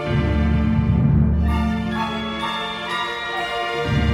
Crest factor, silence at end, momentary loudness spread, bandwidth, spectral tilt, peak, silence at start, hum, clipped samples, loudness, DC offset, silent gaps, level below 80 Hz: 14 dB; 0 s; 7 LU; 11 kHz; -7 dB/octave; -6 dBFS; 0 s; none; under 0.1%; -21 LUFS; under 0.1%; none; -26 dBFS